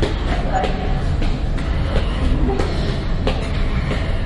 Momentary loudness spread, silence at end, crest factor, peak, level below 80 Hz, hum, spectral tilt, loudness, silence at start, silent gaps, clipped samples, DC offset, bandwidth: 3 LU; 0 s; 16 dB; -2 dBFS; -20 dBFS; none; -7 dB/octave; -21 LUFS; 0 s; none; under 0.1%; under 0.1%; 11 kHz